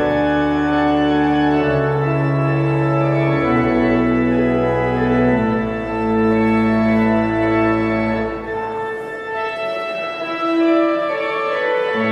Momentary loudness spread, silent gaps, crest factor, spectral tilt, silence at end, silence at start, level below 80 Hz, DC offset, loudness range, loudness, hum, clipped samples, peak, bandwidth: 8 LU; none; 12 dB; -8.5 dB/octave; 0 s; 0 s; -38 dBFS; under 0.1%; 4 LU; -17 LUFS; none; under 0.1%; -4 dBFS; 8.4 kHz